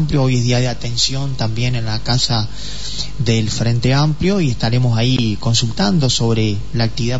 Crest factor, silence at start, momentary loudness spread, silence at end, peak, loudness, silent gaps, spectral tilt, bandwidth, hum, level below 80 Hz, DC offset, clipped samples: 14 dB; 0 s; 6 LU; 0 s; -2 dBFS; -17 LUFS; none; -5 dB/octave; 8 kHz; none; -34 dBFS; 7%; under 0.1%